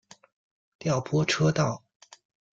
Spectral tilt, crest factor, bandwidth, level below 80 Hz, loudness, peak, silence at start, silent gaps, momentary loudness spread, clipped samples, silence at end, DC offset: -5.5 dB/octave; 18 dB; 7.8 kHz; -60 dBFS; -26 LUFS; -10 dBFS; 0.85 s; none; 10 LU; under 0.1%; 0.75 s; under 0.1%